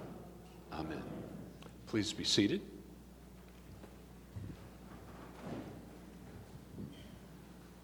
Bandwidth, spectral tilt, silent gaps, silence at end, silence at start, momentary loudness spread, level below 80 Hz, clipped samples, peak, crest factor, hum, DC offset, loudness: over 20 kHz; -4 dB/octave; none; 0 s; 0 s; 21 LU; -60 dBFS; under 0.1%; -18 dBFS; 24 dB; none; under 0.1%; -40 LUFS